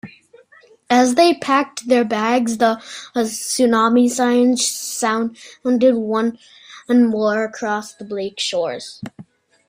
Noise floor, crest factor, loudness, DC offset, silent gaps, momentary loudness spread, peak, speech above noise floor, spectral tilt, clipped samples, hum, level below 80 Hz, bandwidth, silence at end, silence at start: -50 dBFS; 16 dB; -18 LUFS; under 0.1%; none; 12 LU; -2 dBFS; 33 dB; -3.5 dB/octave; under 0.1%; none; -64 dBFS; 16 kHz; 0.45 s; 0.05 s